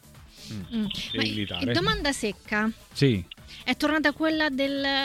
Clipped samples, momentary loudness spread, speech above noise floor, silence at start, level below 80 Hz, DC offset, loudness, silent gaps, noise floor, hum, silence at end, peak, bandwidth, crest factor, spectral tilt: under 0.1%; 10 LU; 21 dB; 0.05 s; -48 dBFS; under 0.1%; -26 LUFS; none; -47 dBFS; none; 0 s; -8 dBFS; 16.5 kHz; 18 dB; -5 dB/octave